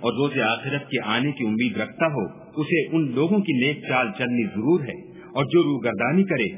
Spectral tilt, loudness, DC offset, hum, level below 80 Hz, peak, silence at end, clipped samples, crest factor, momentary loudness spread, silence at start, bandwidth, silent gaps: -10.5 dB/octave; -23 LUFS; under 0.1%; none; -62 dBFS; -6 dBFS; 0 s; under 0.1%; 18 dB; 7 LU; 0 s; 3.8 kHz; none